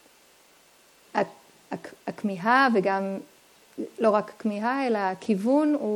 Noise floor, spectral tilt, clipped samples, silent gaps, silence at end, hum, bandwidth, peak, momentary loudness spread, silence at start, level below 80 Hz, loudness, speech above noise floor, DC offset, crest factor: -58 dBFS; -6 dB/octave; under 0.1%; none; 0 s; none; 17 kHz; -8 dBFS; 17 LU; 1.15 s; -78 dBFS; -25 LUFS; 34 dB; under 0.1%; 18 dB